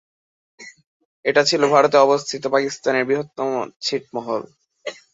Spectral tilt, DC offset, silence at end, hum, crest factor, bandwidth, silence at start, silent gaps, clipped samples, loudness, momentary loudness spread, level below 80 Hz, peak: -3.5 dB/octave; under 0.1%; 0.2 s; none; 20 dB; 8 kHz; 0.6 s; 0.86-1.24 s, 3.76-3.80 s; under 0.1%; -19 LUFS; 13 LU; -68 dBFS; -2 dBFS